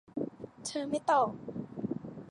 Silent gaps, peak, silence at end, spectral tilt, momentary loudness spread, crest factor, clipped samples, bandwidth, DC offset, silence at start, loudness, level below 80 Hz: none; -16 dBFS; 0 s; -5 dB/octave; 14 LU; 18 dB; under 0.1%; 11.5 kHz; under 0.1%; 0.15 s; -34 LUFS; -70 dBFS